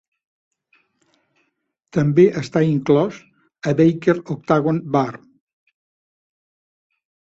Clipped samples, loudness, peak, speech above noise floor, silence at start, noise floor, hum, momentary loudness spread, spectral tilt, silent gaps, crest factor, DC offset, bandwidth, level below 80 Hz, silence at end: under 0.1%; -18 LUFS; -2 dBFS; 55 dB; 1.95 s; -72 dBFS; none; 10 LU; -8 dB/octave; none; 20 dB; under 0.1%; 7.8 kHz; -58 dBFS; 2.2 s